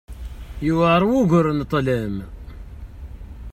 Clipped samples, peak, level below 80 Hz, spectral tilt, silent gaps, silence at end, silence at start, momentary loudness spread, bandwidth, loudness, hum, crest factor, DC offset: under 0.1%; -4 dBFS; -36 dBFS; -7.5 dB/octave; none; 0 s; 0.1 s; 23 LU; 14 kHz; -19 LUFS; none; 16 dB; under 0.1%